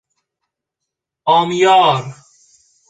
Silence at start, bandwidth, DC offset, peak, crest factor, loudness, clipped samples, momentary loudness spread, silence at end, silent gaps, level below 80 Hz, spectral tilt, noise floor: 1.25 s; 9.4 kHz; under 0.1%; -2 dBFS; 16 dB; -13 LUFS; under 0.1%; 13 LU; 0.75 s; none; -62 dBFS; -4.5 dB/octave; -81 dBFS